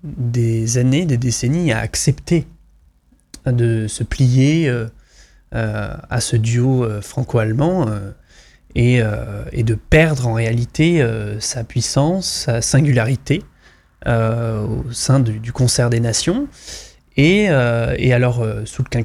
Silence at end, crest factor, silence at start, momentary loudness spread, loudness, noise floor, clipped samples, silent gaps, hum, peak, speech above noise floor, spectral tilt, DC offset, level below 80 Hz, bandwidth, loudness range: 0 s; 16 dB; 0.05 s; 10 LU; -17 LUFS; -54 dBFS; under 0.1%; none; none; -2 dBFS; 38 dB; -5.5 dB/octave; under 0.1%; -36 dBFS; 14 kHz; 3 LU